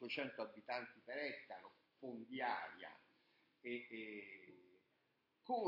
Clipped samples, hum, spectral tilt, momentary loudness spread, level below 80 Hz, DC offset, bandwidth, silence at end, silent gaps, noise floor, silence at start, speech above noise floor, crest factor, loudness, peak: under 0.1%; none; -1.5 dB/octave; 17 LU; under -90 dBFS; under 0.1%; 5.8 kHz; 0 s; none; -83 dBFS; 0 s; 34 dB; 20 dB; -49 LUFS; -30 dBFS